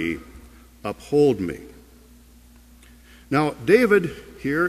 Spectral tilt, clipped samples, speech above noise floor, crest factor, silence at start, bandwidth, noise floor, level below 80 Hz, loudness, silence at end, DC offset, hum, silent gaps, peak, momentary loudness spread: -6.5 dB/octave; under 0.1%; 29 dB; 20 dB; 0 s; 14.5 kHz; -50 dBFS; -50 dBFS; -21 LUFS; 0 s; under 0.1%; none; none; -4 dBFS; 17 LU